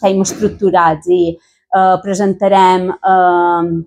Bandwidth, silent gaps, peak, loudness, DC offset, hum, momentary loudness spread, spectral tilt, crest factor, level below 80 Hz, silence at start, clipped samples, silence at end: 14.5 kHz; none; 0 dBFS; -12 LUFS; under 0.1%; none; 6 LU; -5.5 dB/octave; 12 dB; -50 dBFS; 0 s; under 0.1%; 0.05 s